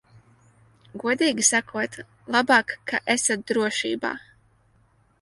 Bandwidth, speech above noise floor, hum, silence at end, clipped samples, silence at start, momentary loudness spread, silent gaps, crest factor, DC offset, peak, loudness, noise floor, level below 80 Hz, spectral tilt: 11.5 kHz; 38 dB; none; 1.05 s; under 0.1%; 0.95 s; 12 LU; none; 20 dB; under 0.1%; -4 dBFS; -23 LUFS; -62 dBFS; -66 dBFS; -1.5 dB/octave